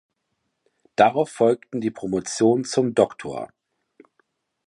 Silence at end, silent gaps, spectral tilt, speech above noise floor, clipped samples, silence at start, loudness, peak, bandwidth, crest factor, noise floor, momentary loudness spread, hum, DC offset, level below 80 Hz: 1.2 s; none; -5 dB/octave; 55 dB; under 0.1%; 1 s; -22 LUFS; -2 dBFS; 11.5 kHz; 22 dB; -76 dBFS; 14 LU; none; under 0.1%; -62 dBFS